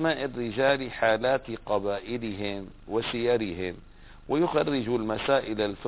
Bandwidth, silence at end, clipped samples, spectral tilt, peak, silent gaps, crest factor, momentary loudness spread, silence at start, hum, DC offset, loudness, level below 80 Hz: 4 kHz; 0 s; under 0.1%; -9.5 dB/octave; -10 dBFS; none; 18 dB; 9 LU; 0 s; none; under 0.1%; -28 LUFS; -52 dBFS